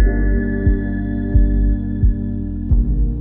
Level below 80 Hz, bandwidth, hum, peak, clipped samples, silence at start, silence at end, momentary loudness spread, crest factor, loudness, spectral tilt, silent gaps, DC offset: -18 dBFS; 2.1 kHz; 50 Hz at -25 dBFS; -2 dBFS; under 0.1%; 0 s; 0 s; 5 LU; 14 dB; -19 LUFS; -13.5 dB/octave; none; under 0.1%